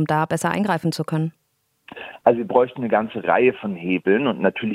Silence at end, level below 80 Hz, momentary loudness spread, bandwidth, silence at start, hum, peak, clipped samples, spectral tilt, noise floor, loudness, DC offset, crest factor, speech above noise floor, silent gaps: 0 s; -64 dBFS; 8 LU; 15 kHz; 0 s; none; -2 dBFS; under 0.1%; -6.5 dB/octave; -69 dBFS; -21 LUFS; under 0.1%; 20 dB; 49 dB; none